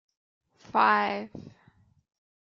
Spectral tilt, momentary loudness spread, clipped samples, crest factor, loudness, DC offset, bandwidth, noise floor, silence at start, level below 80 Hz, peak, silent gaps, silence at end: -5.5 dB/octave; 21 LU; under 0.1%; 22 dB; -26 LUFS; under 0.1%; 7.2 kHz; -63 dBFS; 0.75 s; -72 dBFS; -10 dBFS; none; 1.1 s